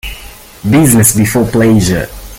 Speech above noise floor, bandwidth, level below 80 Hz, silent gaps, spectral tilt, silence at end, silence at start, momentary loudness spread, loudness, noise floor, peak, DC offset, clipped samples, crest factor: 23 dB; over 20 kHz; -30 dBFS; none; -5 dB/octave; 0 s; 0.05 s; 16 LU; -9 LUFS; -32 dBFS; 0 dBFS; under 0.1%; 0.1%; 10 dB